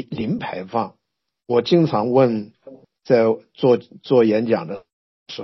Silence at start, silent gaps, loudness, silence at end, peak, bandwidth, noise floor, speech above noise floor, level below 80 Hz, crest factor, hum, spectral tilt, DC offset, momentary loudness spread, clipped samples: 0 s; 4.93-5.26 s; -19 LUFS; 0 s; -2 dBFS; 6 kHz; -47 dBFS; 28 dB; -62 dBFS; 18 dB; none; -6 dB/octave; under 0.1%; 14 LU; under 0.1%